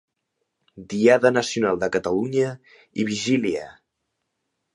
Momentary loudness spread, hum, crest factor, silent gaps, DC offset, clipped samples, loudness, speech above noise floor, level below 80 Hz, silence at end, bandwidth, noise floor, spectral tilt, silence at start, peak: 14 LU; none; 20 dB; none; under 0.1%; under 0.1%; -22 LUFS; 56 dB; -60 dBFS; 1.05 s; 11.5 kHz; -78 dBFS; -5 dB/octave; 0.75 s; -4 dBFS